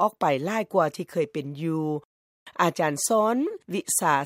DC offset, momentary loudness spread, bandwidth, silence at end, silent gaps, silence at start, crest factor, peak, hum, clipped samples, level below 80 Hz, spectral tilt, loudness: under 0.1%; 9 LU; 16 kHz; 0 s; 2.05-2.46 s; 0 s; 18 dB; -6 dBFS; none; under 0.1%; -76 dBFS; -4.5 dB/octave; -26 LUFS